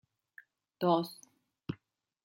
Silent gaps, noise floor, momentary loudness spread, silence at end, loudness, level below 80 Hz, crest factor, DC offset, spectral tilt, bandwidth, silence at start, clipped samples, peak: none; -70 dBFS; 18 LU; 0.5 s; -34 LUFS; -72 dBFS; 22 dB; under 0.1%; -7 dB/octave; 16.5 kHz; 0.8 s; under 0.1%; -16 dBFS